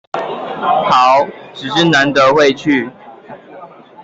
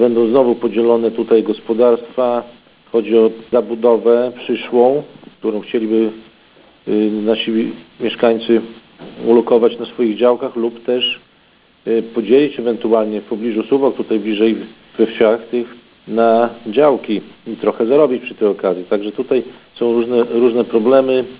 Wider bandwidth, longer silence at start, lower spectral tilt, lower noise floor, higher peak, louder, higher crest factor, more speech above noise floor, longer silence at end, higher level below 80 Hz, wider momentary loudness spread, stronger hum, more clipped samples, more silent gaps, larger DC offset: first, 8 kHz vs 4 kHz; first, 0.15 s vs 0 s; second, -4.5 dB/octave vs -10 dB/octave; second, -36 dBFS vs -51 dBFS; about the same, -2 dBFS vs 0 dBFS; first, -12 LUFS vs -16 LUFS; about the same, 12 dB vs 14 dB; second, 24 dB vs 37 dB; about the same, 0 s vs 0.05 s; about the same, -56 dBFS vs -60 dBFS; first, 13 LU vs 9 LU; neither; neither; neither; neither